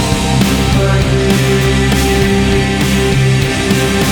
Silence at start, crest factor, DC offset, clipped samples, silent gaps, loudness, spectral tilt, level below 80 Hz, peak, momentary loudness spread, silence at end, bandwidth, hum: 0 s; 10 dB; under 0.1%; under 0.1%; none; -12 LUFS; -5 dB/octave; -20 dBFS; 0 dBFS; 1 LU; 0 s; over 20 kHz; none